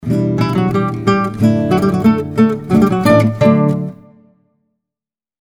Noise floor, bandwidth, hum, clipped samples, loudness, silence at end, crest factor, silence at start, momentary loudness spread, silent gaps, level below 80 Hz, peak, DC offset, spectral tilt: -89 dBFS; 17 kHz; none; under 0.1%; -14 LUFS; 1.5 s; 14 dB; 0 s; 5 LU; none; -44 dBFS; 0 dBFS; under 0.1%; -8 dB/octave